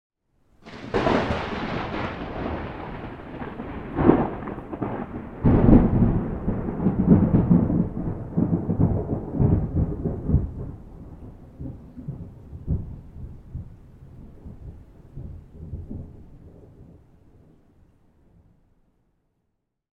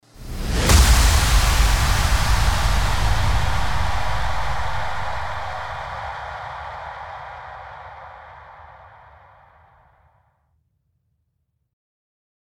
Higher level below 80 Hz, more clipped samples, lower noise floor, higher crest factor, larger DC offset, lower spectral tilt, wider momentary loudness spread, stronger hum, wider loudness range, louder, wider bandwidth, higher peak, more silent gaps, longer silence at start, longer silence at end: second, -34 dBFS vs -24 dBFS; neither; first, -76 dBFS vs -72 dBFS; first, 26 dB vs 20 dB; neither; first, -9.5 dB/octave vs -3.5 dB/octave; first, 24 LU vs 21 LU; neither; about the same, 22 LU vs 21 LU; second, -24 LUFS vs -21 LUFS; second, 6.6 kHz vs 19.5 kHz; about the same, 0 dBFS vs -2 dBFS; neither; first, 0.65 s vs 0 s; first, 3.1 s vs 0.7 s